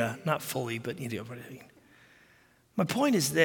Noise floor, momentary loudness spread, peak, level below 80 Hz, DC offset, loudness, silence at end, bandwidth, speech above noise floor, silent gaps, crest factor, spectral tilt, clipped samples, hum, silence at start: -63 dBFS; 18 LU; -10 dBFS; -72 dBFS; under 0.1%; -31 LUFS; 0 s; 17 kHz; 33 dB; none; 22 dB; -4.5 dB/octave; under 0.1%; none; 0 s